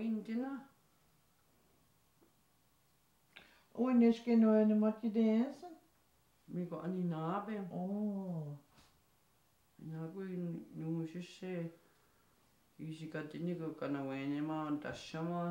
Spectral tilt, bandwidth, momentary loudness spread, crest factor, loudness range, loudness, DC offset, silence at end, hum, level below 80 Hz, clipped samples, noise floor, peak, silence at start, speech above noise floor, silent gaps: -8 dB/octave; 8.6 kHz; 18 LU; 18 dB; 12 LU; -37 LUFS; under 0.1%; 0 s; none; -80 dBFS; under 0.1%; -74 dBFS; -20 dBFS; 0 s; 38 dB; none